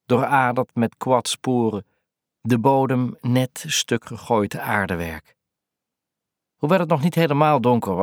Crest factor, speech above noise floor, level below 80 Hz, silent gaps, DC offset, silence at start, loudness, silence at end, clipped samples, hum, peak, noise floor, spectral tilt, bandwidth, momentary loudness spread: 18 dB; 64 dB; -56 dBFS; none; under 0.1%; 0.1 s; -21 LUFS; 0 s; under 0.1%; none; -4 dBFS; -85 dBFS; -5.5 dB/octave; 18 kHz; 9 LU